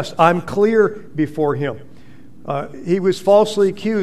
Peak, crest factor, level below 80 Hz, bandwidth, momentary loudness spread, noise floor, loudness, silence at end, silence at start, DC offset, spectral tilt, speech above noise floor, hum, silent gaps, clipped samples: 0 dBFS; 18 dB; -56 dBFS; 13.5 kHz; 12 LU; -44 dBFS; -17 LUFS; 0 s; 0 s; 2%; -6.5 dB/octave; 27 dB; none; none; under 0.1%